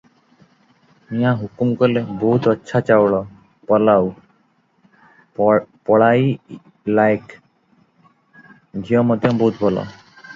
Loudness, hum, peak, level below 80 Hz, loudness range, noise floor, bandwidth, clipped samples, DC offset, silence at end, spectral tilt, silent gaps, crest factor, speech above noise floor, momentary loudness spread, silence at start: -17 LUFS; none; 0 dBFS; -56 dBFS; 3 LU; -60 dBFS; 7.6 kHz; under 0.1%; under 0.1%; 0 s; -8.5 dB/octave; none; 18 dB; 44 dB; 15 LU; 1.1 s